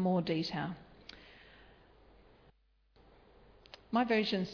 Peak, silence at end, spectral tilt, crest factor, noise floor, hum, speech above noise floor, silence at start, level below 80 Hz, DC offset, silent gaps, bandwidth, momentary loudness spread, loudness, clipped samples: -20 dBFS; 0 s; -4.5 dB/octave; 18 dB; -69 dBFS; none; 36 dB; 0 s; -66 dBFS; under 0.1%; none; 5.4 kHz; 25 LU; -34 LUFS; under 0.1%